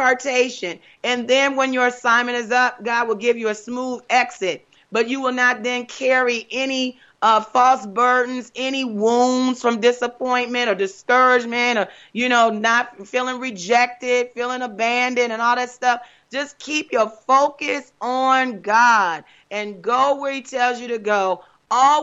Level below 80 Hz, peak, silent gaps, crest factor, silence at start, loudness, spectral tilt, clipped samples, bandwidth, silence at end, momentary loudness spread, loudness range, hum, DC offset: -72 dBFS; -4 dBFS; none; 16 dB; 0 s; -19 LUFS; -2.5 dB/octave; under 0.1%; 8 kHz; 0 s; 10 LU; 2 LU; none; under 0.1%